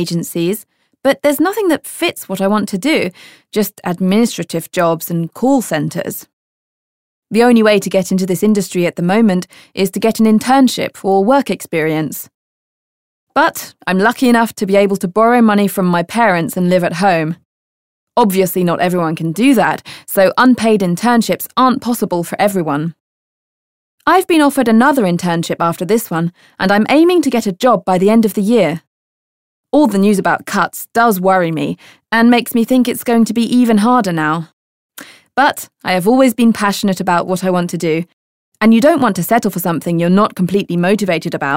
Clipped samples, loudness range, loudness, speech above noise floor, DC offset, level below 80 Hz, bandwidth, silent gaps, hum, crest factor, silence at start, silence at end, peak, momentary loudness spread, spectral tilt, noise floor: under 0.1%; 3 LU; -14 LUFS; over 77 dB; 0.4%; -56 dBFS; 16.5 kHz; 6.33-7.22 s, 12.34-13.27 s, 17.45-18.07 s, 23.00-23.98 s, 28.87-29.64 s, 34.53-34.90 s, 38.13-38.52 s; none; 14 dB; 0 s; 0 s; 0 dBFS; 9 LU; -5.5 dB/octave; under -90 dBFS